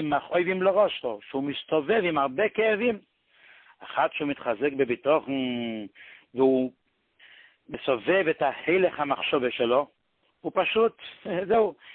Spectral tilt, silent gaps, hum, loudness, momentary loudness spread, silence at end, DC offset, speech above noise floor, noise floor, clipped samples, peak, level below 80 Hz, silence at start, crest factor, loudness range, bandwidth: -9.5 dB/octave; none; none; -26 LUFS; 10 LU; 0 s; under 0.1%; 34 dB; -60 dBFS; under 0.1%; -10 dBFS; -66 dBFS; 0 s; 16 dB; 3 LU; 4.3 kHz